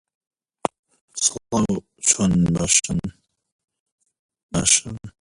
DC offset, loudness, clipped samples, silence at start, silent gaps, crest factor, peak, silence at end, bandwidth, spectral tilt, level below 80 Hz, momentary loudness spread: under 0.1%; -20 LUFS; under 0.1%; 0.65 s; 0.79-0.83 s, 1.01-1.08 s, 3.52-3.68 s, 3.80-3.86 s, 3.92-3.98 s, 4.19-4.29 s, 4.43-4.49 s; 22 dB; 0 dBFS; 0.1 s; 11.5 kHz; -3 dB/octave; -46 dBFS; 13 LU